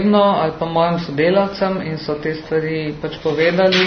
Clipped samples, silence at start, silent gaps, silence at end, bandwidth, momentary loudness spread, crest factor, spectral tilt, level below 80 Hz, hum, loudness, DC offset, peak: under 0.1%; 0 s; none; 0 s; 6.6 kHz; 9 LU; 16 dB; -6.5 dB/octave; -48 dBFS; none; -18 LUFS; under 0.1%; 0 dBFS